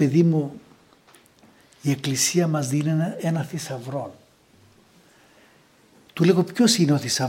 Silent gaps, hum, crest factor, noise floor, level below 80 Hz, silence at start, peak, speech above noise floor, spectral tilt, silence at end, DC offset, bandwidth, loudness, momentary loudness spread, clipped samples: none; none; 18 dB; -56 dBFS; -68 dBFS; 0 s; -4 dBFS; 35 dB; -5 dB/octave; 0 s; under 0.1%; 16.5 kHz; -22 LUFS; 13 LU; under 0.1%